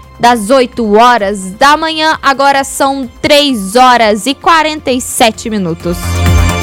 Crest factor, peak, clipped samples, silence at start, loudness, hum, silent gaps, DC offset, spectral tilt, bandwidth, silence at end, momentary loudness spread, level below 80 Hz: 10 dB; 0 dBFS; 1%; 0.2 s; -9 LUFS; none; none; under 0.1%; -4 dB/octave; 18.5 kHz; 0 s; 9 LU; -24 dBFS